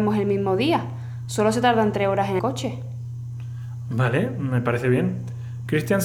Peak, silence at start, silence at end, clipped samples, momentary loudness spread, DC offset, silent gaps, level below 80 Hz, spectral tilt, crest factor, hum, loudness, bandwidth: -6 dBFS; 0 s; 0 s; under 0.1%; 14 LU; under 0.1%; none; -58 dBFS; -6.5 dB/octave; 18 dB; none; -24 LUFS; 15 kHz